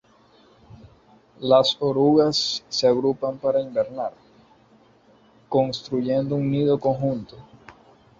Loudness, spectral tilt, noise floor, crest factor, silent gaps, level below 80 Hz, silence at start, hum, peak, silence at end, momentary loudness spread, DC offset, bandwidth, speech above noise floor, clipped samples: -22 LUFS; -6 dB/octave; -56 dBFS; 20 dB; none; -60 dBFS; 0.7 s; none; -4 dBFS; 0.5 s; 10 LU; under 0.1%; 7.8 kHz; 34 dB; under 0.1%